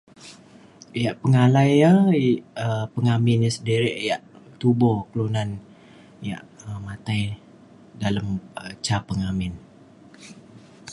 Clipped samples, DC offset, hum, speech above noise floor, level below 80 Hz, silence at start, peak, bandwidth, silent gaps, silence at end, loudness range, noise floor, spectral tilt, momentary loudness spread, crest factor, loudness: under 0.1%; under 0.1%; none; 28 dB; -50 dBFS; 0.25 s; -4 dBFS; 11.5 kHz; none; 0 s; 10 LU; -49 dBFS; -7 dB/octave; 19 LU; 18 dB; -22 LUFS